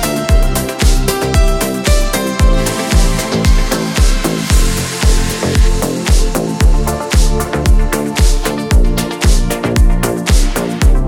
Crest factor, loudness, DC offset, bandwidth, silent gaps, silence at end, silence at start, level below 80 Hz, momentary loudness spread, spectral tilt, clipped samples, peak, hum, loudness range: 10 dB; -14 LUFS; under 0.1%; 17 kHz; none; 0 s; 0 s; -12 dBFS; 2 LU; -4.5 dB/octave; under 0.1%; 0 dBFS; none; 1 LU